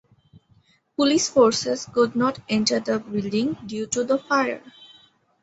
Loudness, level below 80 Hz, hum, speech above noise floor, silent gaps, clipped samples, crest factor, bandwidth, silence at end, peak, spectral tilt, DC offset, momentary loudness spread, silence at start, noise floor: -22 LUFS; -62 dBFS; none; 38 dB; none; under 0.1%; 20 dB; 8.2 kHz; 0.6 s; -4 dBFS; -3.5 dB/octave; under 0.1%; 9 LU; 1 s; -60 dBFS